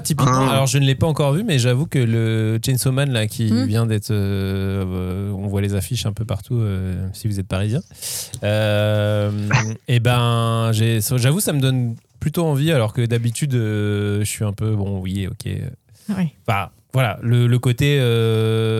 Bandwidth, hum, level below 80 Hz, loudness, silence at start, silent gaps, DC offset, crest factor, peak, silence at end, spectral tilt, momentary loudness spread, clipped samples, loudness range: 15 kHz; none; -46 dBFS; -20 LUFS; 0 s; none; under 0.1%; 18 dB; -2 dBFS; 0 s; -5.5 dB/octave; 8 LU; under 0.1%; 5 LU